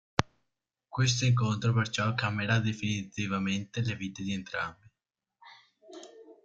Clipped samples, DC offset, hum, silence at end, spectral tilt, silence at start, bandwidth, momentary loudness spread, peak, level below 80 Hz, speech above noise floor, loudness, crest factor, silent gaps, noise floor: under 0.1%; under 0.1%; none; 0.1 s; -5 dB/octave; 0.2 s; 7.8 kHz; 19 LU; -4 dBFS; -60 dBFS; 58 dB; -30 LUFS; 28 dB; none; -88 dBFS